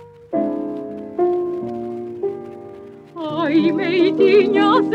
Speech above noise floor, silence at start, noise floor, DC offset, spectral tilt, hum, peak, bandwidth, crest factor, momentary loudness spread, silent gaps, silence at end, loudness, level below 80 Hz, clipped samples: 23 dB; 0 s; -38 dBFS; under 0.1%; -7 dB/octave; none; -4 dBFS; 8.2 kHz; 16 dB; 20 LU; none; 0 s; -19 LUFS; -64 dBFS; under 0.1%